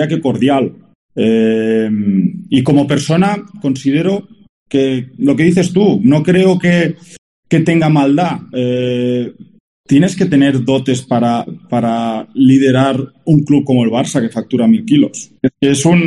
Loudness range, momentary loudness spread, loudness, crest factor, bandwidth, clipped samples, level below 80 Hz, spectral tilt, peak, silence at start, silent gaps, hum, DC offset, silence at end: 2 LU; 8 LU; -13 LUFS; 12 dB; 11.5 kHz; under 0.1%; -50 dBFS; -6.5 dB/octave; 0 dBFS; 0 s; 0.95-1.09 s, 4.49-4.66 s, 7.18-7.43 s, 9.60-9.84 s; none; under 0.1%; 0 s